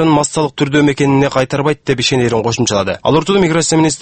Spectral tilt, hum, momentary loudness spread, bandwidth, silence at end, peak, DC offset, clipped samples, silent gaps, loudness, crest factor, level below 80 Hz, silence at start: -4.5 dB/octave; none; 4 LU; 8.8 kHz; 0 s; 0 dBFS; under 0.1%; under 0.1%; none; -13 LUFS; 12 dB; -42 dBFS; 0 s